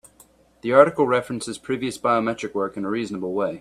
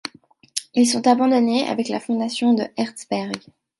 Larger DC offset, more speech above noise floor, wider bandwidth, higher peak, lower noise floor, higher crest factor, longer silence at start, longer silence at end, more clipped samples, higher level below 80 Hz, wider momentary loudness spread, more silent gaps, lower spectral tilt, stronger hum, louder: neither; about the same, 33 dB vs 31 dB; first, 13.5 kHz vs 11.5 kHz; about the same, 0 dBFS vs 0 dBFS; first, -55 dBFS vs -50 dBFS; about the same, 22 dB vs 20 dB; about the same, 0.65 s vs 0.55 s; second, 0 s vs 0.4 s; neither; first, -60 dBFS vs -70 dBFS; about the same, 12 LU vs 13 LU; neither; first, -5.5 dB/octave vs -4 dB/octave; neither; about the same, -22 LUFS vs -21 LUFS